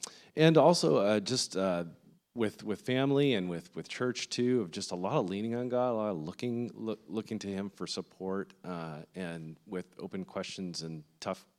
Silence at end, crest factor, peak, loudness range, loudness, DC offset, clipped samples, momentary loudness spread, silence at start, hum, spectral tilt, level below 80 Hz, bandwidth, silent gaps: 0.2 s; 22 dB; -10 dBFS; 11 LU; -32 LUFS; under 0.1%; under 0.1%; 15 LU; 0 s; none; -5 dB/octave; -80 dBFS; 14 kHz; none